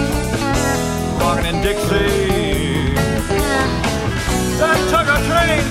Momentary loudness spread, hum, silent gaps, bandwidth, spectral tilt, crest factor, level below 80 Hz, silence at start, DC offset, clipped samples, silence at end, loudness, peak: 5 LU; none; none; 16 kHz; -4.5 dB/octave; 14 dB; -26 dBFS; 0 s; under 0.1%; under 0.1%; 0 s; -17 LUFS; -4 dBFS